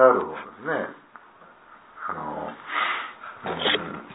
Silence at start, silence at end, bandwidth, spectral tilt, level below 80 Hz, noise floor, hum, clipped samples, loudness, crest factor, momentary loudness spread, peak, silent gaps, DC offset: 0 s; 0 s; 4 kHz; -7.5 dB/octave; -66 dBFS; -51 dBFS; none; under 0.1%; -27 LUFS; 24 dB; 13 LU; -2 dBFS; none; under 0.1%